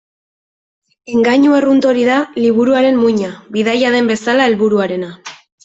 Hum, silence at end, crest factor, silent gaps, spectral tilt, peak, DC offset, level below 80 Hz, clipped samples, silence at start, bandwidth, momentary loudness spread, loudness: none; 0.3 s; 12 dB; none; -5.5 dB/octave; -2 dBFS; under 0.1%; -58 dBFS; under 0.1%; 1.1 s; 8 kHz; 10 LU; -13 LUFS